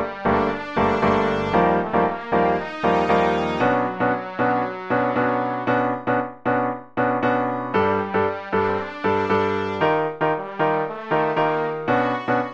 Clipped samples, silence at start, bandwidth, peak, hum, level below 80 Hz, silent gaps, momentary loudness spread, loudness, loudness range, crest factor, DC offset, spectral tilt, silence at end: under 0.1%; 0 s; 7.8 kHz; -4 dBFS; none; -48 dBFS; none; 4 LU; -21 LUFS; 2 LU; 16 dB; under 0.1%; -7.5 dB/octave; 0 s